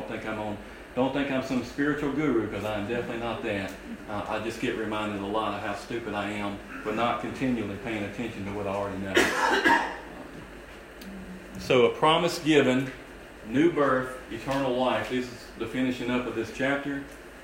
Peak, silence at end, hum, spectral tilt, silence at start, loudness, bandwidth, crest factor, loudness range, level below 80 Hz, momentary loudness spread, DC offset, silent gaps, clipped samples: -8 dBFS; 0 s; none; -5 dB/octave; 0 s; -28 LUFS; 16 kHz; 20 dB; 6 LU; -52 dBFS; 17 LU; under 0.1%; none; under 0.1%